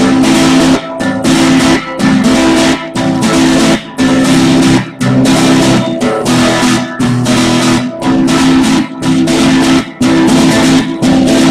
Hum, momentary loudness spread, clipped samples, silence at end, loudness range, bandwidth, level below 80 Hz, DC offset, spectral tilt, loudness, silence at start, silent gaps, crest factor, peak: none; 5 LU; under 0.1%; 0 s; 1 LU; 14.5 kHz; -34 dBFS; under 0.1%; -4.5 dB/octave; -9 LUFS; 0 s; none; 8 dB; 0 dBFS